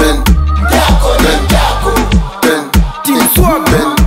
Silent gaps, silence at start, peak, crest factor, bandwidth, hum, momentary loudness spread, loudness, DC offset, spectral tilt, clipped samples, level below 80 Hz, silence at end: none; 0 s; 0 dBFS; 8 dB; 16.5 kHz; none; 4 LU; -10 LUFS; under 0.1%; -4.5 dB/octave; under 0.1%; -14 dBFS; 0 s